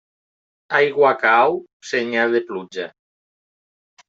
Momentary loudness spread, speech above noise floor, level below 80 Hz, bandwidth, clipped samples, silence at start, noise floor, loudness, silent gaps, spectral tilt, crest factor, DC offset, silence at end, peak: 15 LU; over 72 dB; -74 dBFS; 7.8 kHz; under 0.1%; 0.7 s; under -90 dBFS; -18 LUFS; 1.73-1.80 s; -4.5 dB/octave; 18 dB; under 0.1%; 1.2 s; -2 dBFS